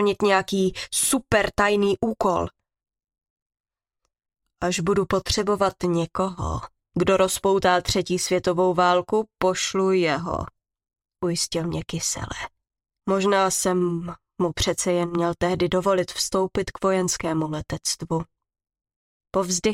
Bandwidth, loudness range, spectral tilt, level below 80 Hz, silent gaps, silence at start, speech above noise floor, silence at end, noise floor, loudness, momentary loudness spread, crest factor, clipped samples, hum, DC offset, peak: 16.5 kHz; 5 LU; -4 dB/octave; -46 dBFS; 3.30-3.36 s, 3.42-3.50 s, 3.60-3.64 s, 18.96-19.20 s; 0 s; 57 dB; 0 s; -80 dBFS; -23 LUFS; 10 LU; 18 dB; under 0.1%; none; under 0.1%; -6 dBFS